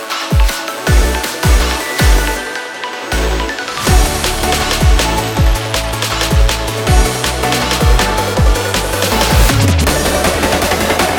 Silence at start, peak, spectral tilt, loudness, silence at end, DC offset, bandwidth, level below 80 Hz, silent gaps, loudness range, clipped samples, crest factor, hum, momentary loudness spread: 0 s; 0 dBFS; -4 dB/octave; -13 LUFS; 0 s; under 0.1%; 19 kHz; -16 dBFS; none; 2 LU; under 0.1%; 12 dB; none; 5 LU